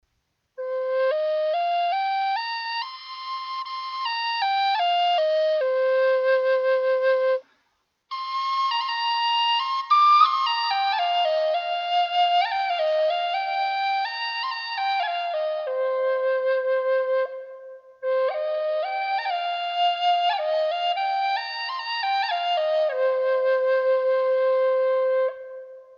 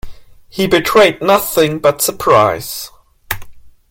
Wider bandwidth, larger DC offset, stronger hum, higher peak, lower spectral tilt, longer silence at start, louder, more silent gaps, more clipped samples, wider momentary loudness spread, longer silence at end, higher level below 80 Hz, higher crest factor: second, 6.8 kHz vs 17 kHz; neither; neither; second, -6 dBFS vs 0 dBFS; second, 1 dB/octave vs -3.5 dB/octave; first, 0.6 s vs 0.05 s; second, -23 LUFS vs -12 LUFS; neither; neither; second, 8 LU vs 14 LU; second, 0.05 s vs 0.2 s; second, -82 dBFS vs -40 dBFS; about the same, 18 dB vs 14 dB